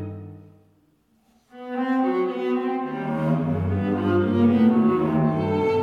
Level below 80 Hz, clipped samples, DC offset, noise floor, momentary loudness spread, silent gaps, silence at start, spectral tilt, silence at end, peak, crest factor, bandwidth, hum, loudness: -56 dBFS; under 0.1%; under 0.1%; -63 dBFS; 13 LU; none; 0 s; -9.5 dB/octave; 0 s; -8 dBFS; 14 dB; 5.4 kHz; none; -22 LUFS